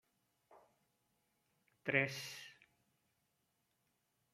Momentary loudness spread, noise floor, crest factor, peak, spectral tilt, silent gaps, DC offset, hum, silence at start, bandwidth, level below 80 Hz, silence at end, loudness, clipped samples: 18 LU; -83 dBFS; 30 dB; -18 dBFS; -4 dB/octave; none; under 0.1%; none; 0.5 s; 16 kHz; -88 dBFS; 1.8 s; -39 LUFS; under 0.1%